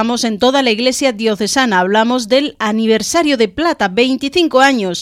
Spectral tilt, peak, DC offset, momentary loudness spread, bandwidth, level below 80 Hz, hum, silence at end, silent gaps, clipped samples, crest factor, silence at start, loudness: -3.5 dB/octave; 0 dBFS; under 0.1%; 4 LU; 16 kHz; -48 dBFS; none; 0 s; none; under 0.1%; 14 dB; 0 s; -13 LUFS